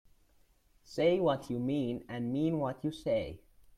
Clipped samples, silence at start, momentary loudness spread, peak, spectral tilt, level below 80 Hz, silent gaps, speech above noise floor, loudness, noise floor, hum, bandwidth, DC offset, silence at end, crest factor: under 0.1%; 0.9 s; 9 LU; -16 dBFS; -7.5 dB/octave; -62 dBFS; none; 35 dB; -33 LUFS; -67 dBFS; none; 14 kHz; under 0.1%; 0.4 s; 18 dB